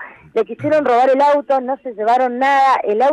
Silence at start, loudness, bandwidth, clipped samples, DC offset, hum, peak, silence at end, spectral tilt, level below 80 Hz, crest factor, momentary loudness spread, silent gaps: 0 s; -15 LUFS; 10.5 kHz; under 0.1%; under 0.1%; none; -4 dBFS; 0 s; -5.5 dB/octave; -64 dBFS; 10 dB; 9 LU; none